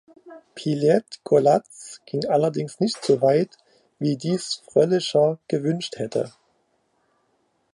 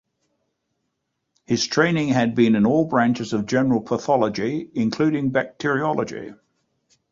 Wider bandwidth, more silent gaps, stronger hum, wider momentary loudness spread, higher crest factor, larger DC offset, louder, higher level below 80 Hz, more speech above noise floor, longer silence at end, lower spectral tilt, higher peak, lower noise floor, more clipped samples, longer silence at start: first, 11 kHz vs 7.6 kHz; neither; neither; first, 12 LU vs 8 LU; about the same, 18 dB vs 18 dB; neither; about the same, -22 LUFS vs -21 LUFS; second, -70 dBFS vs -58 dBFS; second, 47 dB vs 56 dB; first, 1.45 s vs 0.8 s; about the same, -6 dB/octave vs -5.5 dB/octave; about the same, -4 dBFS vs -4 dBFS; second, -68 dBFS vs -76 dBFS; neither; second, 0.25 s vs 1.5 s